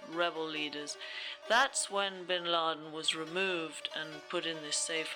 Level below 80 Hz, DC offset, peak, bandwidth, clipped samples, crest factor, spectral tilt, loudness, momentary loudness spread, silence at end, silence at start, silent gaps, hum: -86 dBFS; under 0.1%; -16 dBFS; over 20 kHz; under 0.1%; 18 dB; -1 dB/octave; -34 LUFS; 10 LU; 0 s; 0 s; none; none